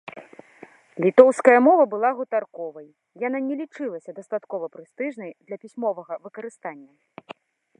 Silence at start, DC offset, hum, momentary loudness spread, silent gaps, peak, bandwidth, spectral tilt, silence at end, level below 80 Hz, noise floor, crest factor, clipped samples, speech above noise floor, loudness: 0.05 s; under 0.1%; none; 22 LU; none; 0 dBFS; 10 kHz; -6.5 dB/octave; 0.5 s; -80 dBFS; -49 dBFS; 22 dB; under 0.1%; 27 dB; -21 LUFS